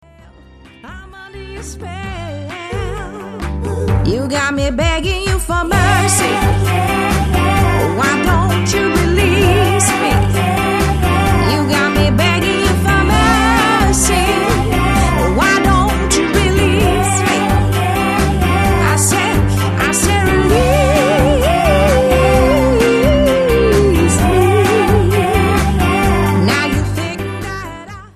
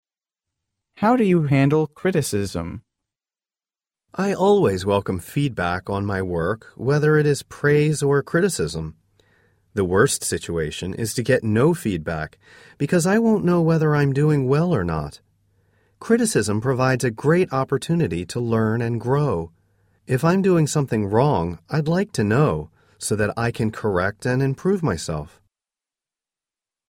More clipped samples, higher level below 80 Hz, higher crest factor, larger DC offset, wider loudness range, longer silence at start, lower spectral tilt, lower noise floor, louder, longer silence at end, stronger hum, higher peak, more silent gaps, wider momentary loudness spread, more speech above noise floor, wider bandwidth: neither; first, -22 dBFS vs -48 dBFS; second, 12 dB vs 20 dB; neither; first, 6 LU vs 3 LU; about the same, 0.85 s vs 0.95 s; about the same, -5 dB/octave vs -6 dB/octave; second, -41 dBFS vs under -90 dBFS; first, -13 LUFS vs -21 LUFS; second, 0.1 s vs 1.65 s; neither; about the same, 0 dBFS vs -2 dBFS; neither; about the same, 12 LU vs 10 LU; second, 24 dB vs over 70 dB; second, 14 kHz vs 16 kHz